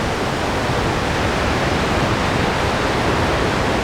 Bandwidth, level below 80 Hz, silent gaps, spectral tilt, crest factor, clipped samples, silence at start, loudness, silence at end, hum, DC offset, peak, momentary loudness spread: 19.5 kHz; -30 dBFS; none; -5 dB/octave; 14 dB; under 0.1%; 0 s; -18 LUFS; 0 s; none; under 0.1%; -6 dBFS; 2 LU